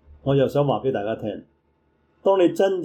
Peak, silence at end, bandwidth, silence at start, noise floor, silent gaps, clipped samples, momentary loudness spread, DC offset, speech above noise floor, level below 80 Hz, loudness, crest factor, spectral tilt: -8 dBFS; 0 s; 13.5 kHz; 0.25 s; -65 dBFS; none; under 0.1%; 11 LU; under 0.1%; 44 dB; -56 dBFS; -22 LUFS; 14 dB; -7.5 dB/octave